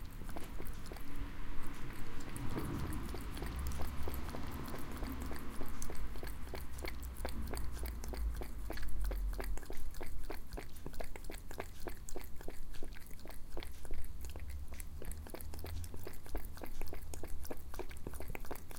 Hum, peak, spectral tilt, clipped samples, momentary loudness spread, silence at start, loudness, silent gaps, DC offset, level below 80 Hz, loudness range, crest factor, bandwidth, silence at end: none; -22 dBFS; -5 dB/octave; under 0.1%; 7 LU; 0 s; -47 LUFS; none; under 0.1%; -44 dBFS; 6 LU; 14 dB; 17 kHz; 0 s